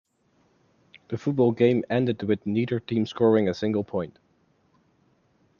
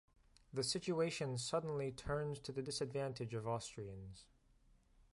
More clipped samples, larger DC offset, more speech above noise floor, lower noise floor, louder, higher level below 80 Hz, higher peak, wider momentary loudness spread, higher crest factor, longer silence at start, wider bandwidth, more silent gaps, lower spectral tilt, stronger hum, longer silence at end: neither; neither; first, 42 dB vs 29 dB; second, -66 dBFS vs -71 dBFS; first, -25 LUFS vs -42 LUFS; about the same, -68 dBFS vs -66 dBFS; first, -6 dBFS vs -26 dBFS; about the same, 10 LU vs 12 LU; about the same, 20 dB vs 18 dB; first, 1.1 s vs 0.55 s; second, 7.2 kHz vs 11.5 kHz; neither; first, -8 dB/octave vs -4.5 dB/octave; neither; first, 1.5 s vs 0.1 s